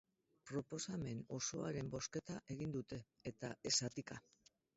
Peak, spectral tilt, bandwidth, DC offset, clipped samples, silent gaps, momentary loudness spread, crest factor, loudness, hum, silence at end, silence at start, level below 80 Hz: -24 dBFS; -5 dB/octave; 7.6 kHz; under 0.1%; under 0.1%; none; 14 LU; 22 dB; -45 LUFS; none; 0.55 s; 0.45 s; -72 dBFS